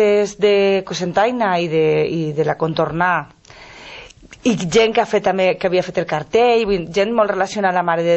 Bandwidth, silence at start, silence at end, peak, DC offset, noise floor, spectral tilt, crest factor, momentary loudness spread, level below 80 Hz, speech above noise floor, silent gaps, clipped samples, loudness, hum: 8.4 kHz; 0 s; 0 s; -2 dBFS; under 0.1%; -40 dBFS; -5 dB/octave; 16 dB; 7 LU; -50 dBFS; 24 dB; none; under 0.1%; -17 LUFS; none